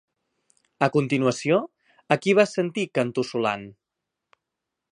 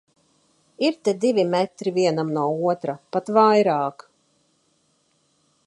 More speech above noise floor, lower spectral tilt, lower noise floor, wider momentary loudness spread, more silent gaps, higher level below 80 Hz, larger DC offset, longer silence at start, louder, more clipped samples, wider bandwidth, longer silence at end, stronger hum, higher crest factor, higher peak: first, 61 dB vs 45 dB; about the same, -5.5 dB/octave vs -6 dB/octave; first, -84 dBFS vs -66 dBFS; second, 6 LU vs 10 LU; neither; first, -70 dBFS vs -76 dBFS; neither; about the same, 0.8 s vs 0.8 s; about the same, -23 LUFS vs -21 LUFS; neither; about the same, 11 kHz vs 11.5 kHz; second, 1.2 s vs 1.75 s; neither; first, 24 dB vs 18 dB; about the same, -2 dBFS vs -4 dBFS